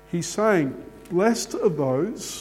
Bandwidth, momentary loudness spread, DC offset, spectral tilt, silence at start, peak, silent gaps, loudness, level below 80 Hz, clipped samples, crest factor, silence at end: 16.5 kHz; 8 LU; under 0.1%; -5 dB/octave; 0.1 s; -6 dBFS; none; -23 LUFS; -56 dBFS; under 0.1%; 18 dB; 0 s